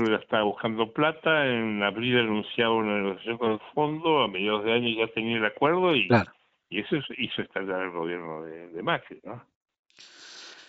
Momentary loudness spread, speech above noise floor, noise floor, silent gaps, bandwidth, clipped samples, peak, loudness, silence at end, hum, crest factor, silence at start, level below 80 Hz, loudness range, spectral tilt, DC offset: 15 LU; 24 dB; -50 dBFS; 9.56-9.61 s, 9.79-9.83 s; 7.8 kHz; under 0.1%; -6 dBFS; -26 LUFS; 0.05 s; none; 20 dB; 0 s; -66 dBFS; 7 LU; -3 dB/octave; under 0.1%